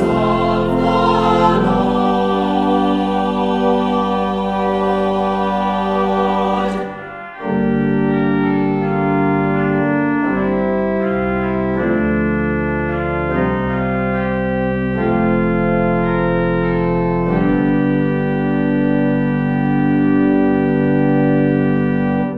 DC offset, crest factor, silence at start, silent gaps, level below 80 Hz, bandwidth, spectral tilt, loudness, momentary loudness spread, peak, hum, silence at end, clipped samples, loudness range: under 0.1%; 14 dB; 0 s; none; -34 dBFS; 8.2 kHz; -8.5 dB/octave; -16 LUFS; 4 LU; 0 dBFS; none; 0 s; under 0.1%; 3 LU